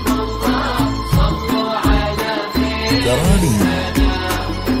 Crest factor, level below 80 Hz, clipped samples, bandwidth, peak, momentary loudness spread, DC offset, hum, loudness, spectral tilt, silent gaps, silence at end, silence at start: 16 dB; -22 dBFS; under 0.1%; 16.5 kHz; 0 dBFS; 5 LU; under 0.1%; none; -17 LUFS; -5.5 dB/octave; none; 0 s; 0 s